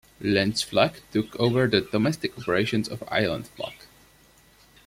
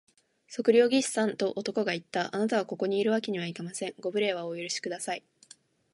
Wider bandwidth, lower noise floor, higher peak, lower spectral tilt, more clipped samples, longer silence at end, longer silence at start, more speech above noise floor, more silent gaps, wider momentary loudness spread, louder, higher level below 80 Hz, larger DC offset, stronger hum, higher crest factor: first, 16.5 kHz vs 11.5 kHz; about the same, -57 dBFS vs -58 dBFS; first, -4 dBFS vs -10 dBFS; first, -5.5 dB/octave vs -4 dB/octave; neither; first, 1.1 s vs 0.75 s; second, 0.2 s vs 0.5 s; about the same, 32 dB vs 29 dB; neither; second, 9 LU vs 12 LU; first, -25 LUFS vs -29 LUFS; first, -56 dBFS vs -80 dBFS; neither; neither; about the same, 22 dB vs 20 dB